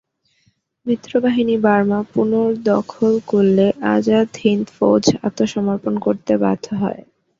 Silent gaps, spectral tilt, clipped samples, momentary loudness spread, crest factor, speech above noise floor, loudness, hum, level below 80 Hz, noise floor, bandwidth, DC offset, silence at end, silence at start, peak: none; -6.5 dB/octave; under 0.1%; 7 LU; 16 dB; 46 dB; -17 LUFS; none; -56 dBFS; -63 dBFS; 7.6 kHz; under 0.1%; 0.4 s; 0.85 s; -2 dBFS